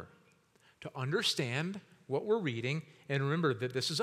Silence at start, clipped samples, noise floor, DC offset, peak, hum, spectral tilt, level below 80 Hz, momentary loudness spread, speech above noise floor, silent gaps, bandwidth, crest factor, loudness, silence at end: 0 s; under 0.1%; -67 dBFS; under 0.1%; -18 dBFS; none; -5 dB/octave; -84 dBFS; 14 LU; 33 dB; none; 15 kHz; 18 dB; -34 LUFS; 0 s